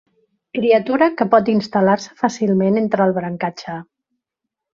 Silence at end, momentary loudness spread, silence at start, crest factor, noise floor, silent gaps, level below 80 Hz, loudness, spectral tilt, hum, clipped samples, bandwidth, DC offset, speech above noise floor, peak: 0.95 s; 12 LU; 0.55 s; 18 dB; -82 dBFS; none; -60 dBFS; -17 LUFS; -6.5 dB/octave; none; under 0.1%; 7.4 kHz; under 0.1%; 65 dB; -2 dBFS